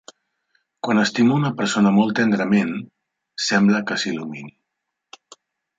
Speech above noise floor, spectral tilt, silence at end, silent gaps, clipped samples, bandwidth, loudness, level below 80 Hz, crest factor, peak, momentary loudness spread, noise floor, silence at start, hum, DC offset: 61 dB; -5 dB/octave; 1.3 s; none; under 0.1%; 8 kHz; -19 LUFS; -64 dBFS; 18 dB; -4 dBFS; 15 LU; -80 dBFS; 0.85 s; none; under 0.1%